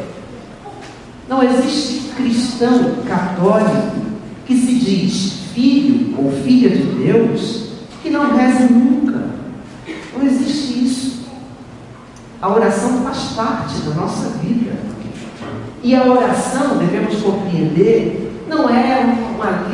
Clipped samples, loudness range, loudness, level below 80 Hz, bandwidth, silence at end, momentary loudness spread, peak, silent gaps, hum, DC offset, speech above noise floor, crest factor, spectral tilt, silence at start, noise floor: under 0.1%; 5 LU; -15 LUFS; -48 dBFS; 11.5 kHz; 0 s; 18 LU; 0 dBFS; none; none; under 0.1%; 22 dB; 16 dB; -6 dB/octave; 0 s; -36 dBFS